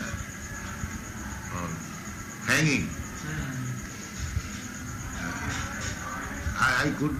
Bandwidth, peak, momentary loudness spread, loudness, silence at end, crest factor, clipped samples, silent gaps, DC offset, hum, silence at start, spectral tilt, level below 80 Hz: 15.5 kHz; -10 dBFS; 13 LU; -31 LUFS; 0 s; 22 dB; under 0.1%; none; under 0.1%; none; 0 s; -4 dB/octave; -44 dBFS